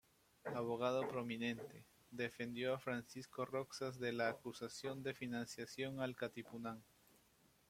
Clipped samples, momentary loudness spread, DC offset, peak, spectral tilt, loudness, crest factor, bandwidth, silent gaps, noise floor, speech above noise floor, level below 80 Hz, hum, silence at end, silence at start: under 0.1%; 10 LU; under 0.1%; -24 dBFS; -5 dB/octave; -45 LUFS; 22 dB; 16.5 kHz; none; -74 dBFS; 29 dB; -80 dBFS; none; 0.85 s; 0.45 s